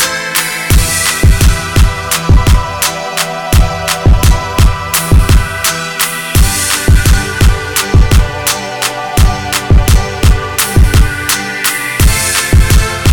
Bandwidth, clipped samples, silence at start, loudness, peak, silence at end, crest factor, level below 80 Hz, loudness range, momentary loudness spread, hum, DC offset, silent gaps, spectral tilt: over 20 kHz; 0.3%; 0 s; -11 LUFS; 0 dBFS; 0 s; 10 dB; -12 dBFS; 1 LU; 5 LU; none; 1%; none; -3.5 dB/octave